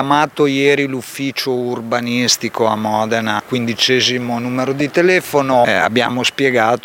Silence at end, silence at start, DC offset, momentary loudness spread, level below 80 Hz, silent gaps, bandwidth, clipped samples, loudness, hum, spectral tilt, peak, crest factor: 0.05 s; 0 s; under 0.1%; 7 LU; -60 dBFS; none; 17 kHz; under 0.1%; -15 LUFS; none; -3.5 dB/octave; 0 dBFS; 14 dB